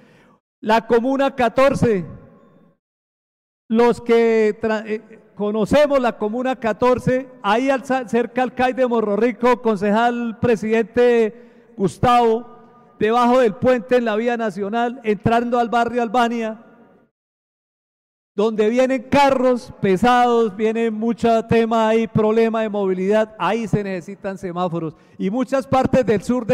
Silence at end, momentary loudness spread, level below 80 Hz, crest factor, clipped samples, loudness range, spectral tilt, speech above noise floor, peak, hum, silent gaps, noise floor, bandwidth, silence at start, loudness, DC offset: 0 s; 9 LU; -50 dBFS; 10 dB; under 0.1%; 4 LU; -6.5 dB/octave; 33 dB; -8 dBFS; none; 2.79-3.69 s, 17.11-18.35 s; -51 dBFS; 13 kHz; 0.65 s; -18 LUFS; under 0.1%